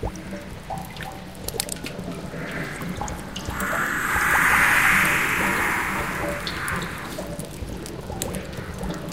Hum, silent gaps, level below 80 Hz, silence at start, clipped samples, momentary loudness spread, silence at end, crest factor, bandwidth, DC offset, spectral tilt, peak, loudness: none; none; -40 dBFS; 0 s; under 0.1%; 17 LU; 0 s; 20 dB; 16.5 kHz; 0.4%; -3.5 dB/octave; -6 dBFS; -23 LUFS